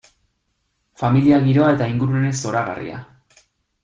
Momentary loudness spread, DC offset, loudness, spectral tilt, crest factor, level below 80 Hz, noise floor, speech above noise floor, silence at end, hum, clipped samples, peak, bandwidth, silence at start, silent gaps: 15 LU; under 0.1%; -18 LUFS; -7 dB/octave; 16 dB; -52 dBFS; -70 dBFS; 53 dB; 0.8 s; none; under 0.1%; -4 dBFS; 9.4 kHz; 1 s; none